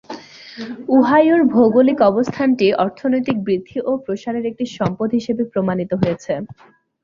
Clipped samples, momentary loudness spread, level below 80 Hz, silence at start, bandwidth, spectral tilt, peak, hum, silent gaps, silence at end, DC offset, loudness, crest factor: under 0.1%; 15 LU; -56 dBFS; 0.1 s; 7.4 kHz; -7.5 dB/octave; -2 dBFS; none; none; 0.5 s; under 0.1%; -17 LUFS; 16 dB